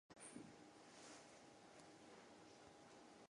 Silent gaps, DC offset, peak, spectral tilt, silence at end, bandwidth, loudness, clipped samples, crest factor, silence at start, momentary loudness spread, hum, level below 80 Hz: none; under 0.1%; -44 dBFS; -3 dB/octave; 0 s; 11 kHz; -63 LUFS; under 0.1%; 20 dB; 0.1 s; 5 LU; none; -88 dBFS